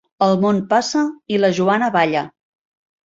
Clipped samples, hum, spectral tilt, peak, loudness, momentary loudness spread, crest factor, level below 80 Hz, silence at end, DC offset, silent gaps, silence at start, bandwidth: under 0.1%; none; -5.5 dB/octave; -2 dBFS; -17 LUFS; 5 LU; 16 dB; -62 dBFS; 0.75 s; under 0.1%; none; 0.2 s; 7.8 kHz